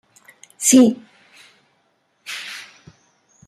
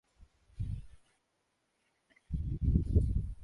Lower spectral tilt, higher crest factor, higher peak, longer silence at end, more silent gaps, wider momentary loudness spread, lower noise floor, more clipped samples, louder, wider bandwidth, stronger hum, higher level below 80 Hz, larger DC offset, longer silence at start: second, -3 dB/octave vs -10.5 dB/octave; about the same, 20 dB vs 22 dB; first, -2 dBFS vs -14 dBFS; first, 0.9 s vs 0 s; neither; first, 23 LU vs 13 LU; second, -65 dBFS vs -80 dBFS; neither; first, -16 LUFS vs -35 LUFS; first, 14.5 kHz vs 3.5 kHz; neither; second, -68 dBFS vs -38 dBFS; neither; first, 0.6 s vs 0.2 s